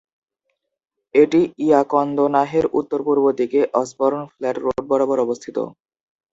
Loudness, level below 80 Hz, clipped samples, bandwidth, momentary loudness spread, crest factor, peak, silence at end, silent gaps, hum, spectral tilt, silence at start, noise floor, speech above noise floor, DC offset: -19 LUFS; -58 dBFS; under 0.1%; 8 kHz; 9 LU; 18 dB; -2 dBFS; 0.6 s; none; none; -6.5 dB/octave; 1.15 s; -75 dBFS; 57 dB; under 0.1%